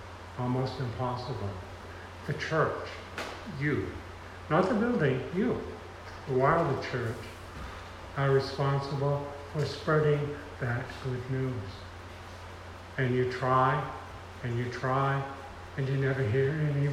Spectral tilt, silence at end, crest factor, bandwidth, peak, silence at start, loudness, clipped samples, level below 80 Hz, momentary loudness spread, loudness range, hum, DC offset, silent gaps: -7 dB/octave; 0 s; 20 dB; 12 kHz; -10 dBFS; 0 s; -31 LUFS; under 0.1%; -54 dBFS; 17 LU; 4 LU; none; under 0.1%; none